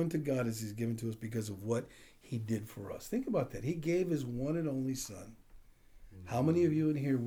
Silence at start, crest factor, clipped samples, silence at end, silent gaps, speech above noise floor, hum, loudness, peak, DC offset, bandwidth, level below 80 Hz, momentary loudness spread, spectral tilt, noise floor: 0 s; 18 dB; under 0.1%; 0 s; none; 23 dB; none; -36 LUFS; -18 dBFS; under 0.1%; over 20 kHz; -60 dBFS; 14 LU; -7 dB/octave; -58 dBFS